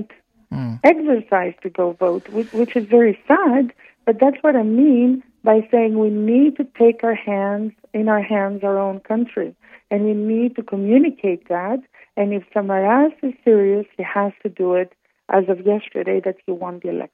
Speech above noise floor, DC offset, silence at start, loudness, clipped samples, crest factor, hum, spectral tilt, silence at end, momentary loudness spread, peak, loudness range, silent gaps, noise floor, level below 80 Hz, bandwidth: 22 dB; under 0.1%; 0 s; -18 LUFS; under 0.1%; 18 dB; none; -9.5 dB/octave; 0.1 s; 11 LU; 0 dBFS; 5 LU; none; -40 dBFS; -66 dBFS; 5.2 kHz